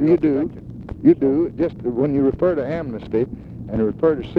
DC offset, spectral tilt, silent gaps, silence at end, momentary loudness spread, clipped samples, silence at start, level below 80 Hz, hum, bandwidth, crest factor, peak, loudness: under 0.1%; -10.5 dB/octave; none; 0 s; 11 LU; under 0.1%; 0 s; -42 dBFS; none; 5 kHz; 16 dB; -2 dBFS; -20 LUFS